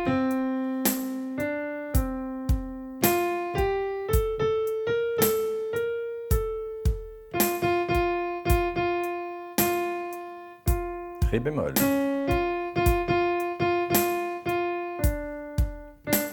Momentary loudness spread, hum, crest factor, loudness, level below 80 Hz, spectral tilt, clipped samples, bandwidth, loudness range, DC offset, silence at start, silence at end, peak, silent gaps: 8 LU; none; 20 dB; -27 LUFS; -34 dBFS; -5.5 dB/octave; under 0.1%; 19 kHz; 3 LU; under 0.1%; 0 s; 0 s; -6 dBFS; none